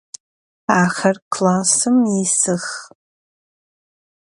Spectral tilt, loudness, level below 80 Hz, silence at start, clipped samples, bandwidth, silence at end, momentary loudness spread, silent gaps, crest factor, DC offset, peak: -4 dB/octave; -16 LUFS; -64 dBFS; 0.7 s; under 0.1%; 11 kHz; 1.35 s; 12 LU; 1.22-1.31 s; 20 dB; under 0.1%; 0 dBFS